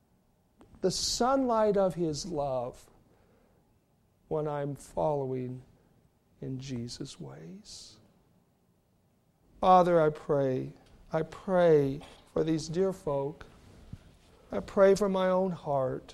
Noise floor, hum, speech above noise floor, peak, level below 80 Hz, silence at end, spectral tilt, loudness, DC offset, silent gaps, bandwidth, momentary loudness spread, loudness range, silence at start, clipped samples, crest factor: -69 dBFS; none; 40 dB; -10 dBFS; -58 dBFS; 0 s; -5.5 dB/octave; -29 LUFS; under 0.1%; none; 14 kHz; 19 LU; 14 LU; 0.85 s; under 0.1%; 22 dB